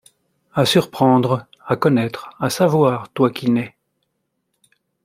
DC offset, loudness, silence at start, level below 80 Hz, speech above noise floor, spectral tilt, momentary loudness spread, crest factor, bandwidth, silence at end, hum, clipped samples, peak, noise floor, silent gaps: under 0.1%; -18 LUFS; 0.55 s; -58 dBFS; 56 dB; -6 dB/octave; 9 LU; 18 dB; 16 kHz; 1.35 s; none; under 0.1%; -2 dBFS; -73 dBFS; none